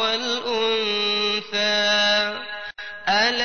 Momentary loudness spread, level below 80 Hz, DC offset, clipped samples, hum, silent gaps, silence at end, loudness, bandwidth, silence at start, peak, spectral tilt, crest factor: 13 LU; -60 dBFS; 0.5%; under 0.1%; none; none; 0 s; -20 LUFS; 6.6 kHz; 0 s; -8 dBFS; -1.5 dB/octave; 16 dB